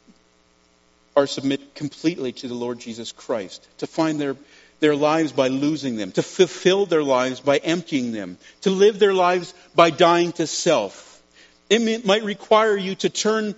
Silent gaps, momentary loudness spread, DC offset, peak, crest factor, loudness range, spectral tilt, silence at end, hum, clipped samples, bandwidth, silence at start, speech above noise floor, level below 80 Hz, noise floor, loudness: none; 12 LU; under 0.1%; 0 dBFS; 20 dB; 7 LU; -3.5 dB/octave; 0.05 s; none; under 0.1%; 8 kHz; 1.15 s; 39 dB; -68 dBFS; -59 dBFS; -21 LUFS